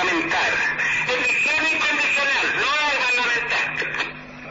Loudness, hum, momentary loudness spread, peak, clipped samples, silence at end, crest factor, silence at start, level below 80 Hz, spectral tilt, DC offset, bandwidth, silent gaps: -19 LUFS; none; 6 LU; -12 dBFS; under 0.1%; 0 s; 8 dB; 0 s; -54 dBFS; 0.5 dB/octave; under 0.1%; 8 kHz; none